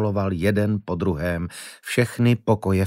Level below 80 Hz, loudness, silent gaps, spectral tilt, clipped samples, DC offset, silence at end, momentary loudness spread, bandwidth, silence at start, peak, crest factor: -46 dBFS; -23 LUFS; none; -7 dB/octave; under 0.1%; under 0.1%; 0 s; 8 LU; 16 kHz; 0 s; -4 dBFS; 18 dB